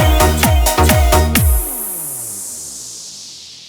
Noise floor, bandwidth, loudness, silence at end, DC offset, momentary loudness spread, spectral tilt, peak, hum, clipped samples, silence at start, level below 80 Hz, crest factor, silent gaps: -34 dBFS; over 20 kHz; -14 LUFS; 0 s; under 0.1%; 16 LU; -4 dB/octave; 0 dBFS; none; under 0.1%; 0 s; -20 dBFS; 14 dB; none